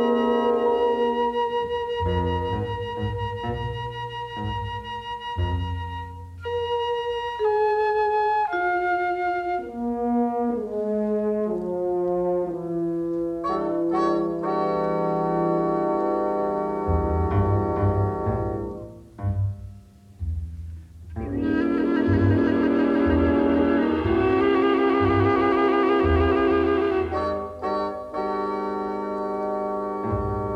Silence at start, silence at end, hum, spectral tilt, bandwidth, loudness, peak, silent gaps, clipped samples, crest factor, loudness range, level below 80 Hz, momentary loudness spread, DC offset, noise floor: 0 s; 0 s; none; -8.5 dB/octave; 8.4 kHz; -24 LUFS; -8 dBFS; none; under 0.1%; 14 dB; 9 LU; -40 dBFS; 11 LU; under 0.1%; -46 dBFS